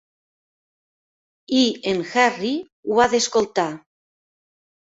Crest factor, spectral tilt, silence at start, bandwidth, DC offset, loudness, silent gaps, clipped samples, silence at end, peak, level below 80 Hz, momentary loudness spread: 22 dB; -3 dB/octave; 1.5 s; 8 kHz; under 0.1%; -20 LUFS; 2.72-2.83 s; under 0.1%; 1.1 s; -2 dBFS; -60 dBFS; 9 LU